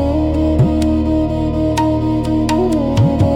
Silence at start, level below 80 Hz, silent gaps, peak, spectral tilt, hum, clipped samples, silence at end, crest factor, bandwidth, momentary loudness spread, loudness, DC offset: 0 s; -26 dBFS; none; -4 dBFS; -8 dB/octave; none; under 0.1%; 0 s; 10 dB; 12.5 kHz; 3 LU; -15 LUFS; under 0.1%